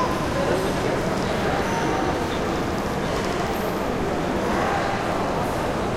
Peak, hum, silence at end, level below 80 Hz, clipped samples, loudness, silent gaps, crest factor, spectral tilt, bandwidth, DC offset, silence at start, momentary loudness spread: -10 dBFS; none; 0 s; -38 dBFS; under 0.1%; -24 LUFS; none; 12 dB; -5.5 dB/octave; 16.5 kHz; under 0.1%; 0 s; 2 LU